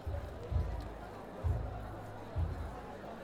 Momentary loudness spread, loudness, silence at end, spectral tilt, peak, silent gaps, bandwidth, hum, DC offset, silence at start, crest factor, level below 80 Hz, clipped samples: 9 LU; -41 LUFS; 0 s; -8 dB/octave; -24 dBFS; none; 13 kHz; none; under 0.1%; 0 s; 16 dB; -44 dBFS; under 0.1%